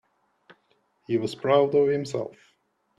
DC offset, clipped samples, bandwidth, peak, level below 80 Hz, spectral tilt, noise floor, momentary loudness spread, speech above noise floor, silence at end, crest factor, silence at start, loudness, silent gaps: under 0.1%; under 0.1%; 10.5 kHz; -8 dBFS; -70 dBFS; -6.5 dB/octave; -69 dBFS; 12 LU; 45 dB; 0.7 s; 20 dB; 1.1 s; -24 LUFS; none